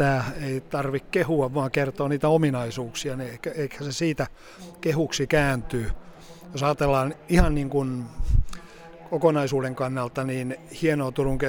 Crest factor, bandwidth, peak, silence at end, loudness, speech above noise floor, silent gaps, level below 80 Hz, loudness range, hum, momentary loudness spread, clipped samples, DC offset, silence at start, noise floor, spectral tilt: 20 dB; 18.5 kHz; -4 dBFS; 0 s; -26 LUFS; 20 dB; none; -34 dBFS; 2 LU; none; 11 LU; under 0.1%; under 0.1%; 0 s; -44 dBFS; -6 dB/octave